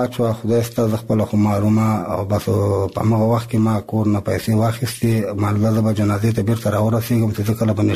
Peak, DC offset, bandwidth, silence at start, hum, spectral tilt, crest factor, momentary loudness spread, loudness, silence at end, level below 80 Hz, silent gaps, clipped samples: -6 dBFS; 0.2%; 14.5 kHz; 0 s; none; -7.5 dB/octave; 12 dB; 3 LU; -18 LUFS; 0 s; -46 dBFS; none; under 0.1%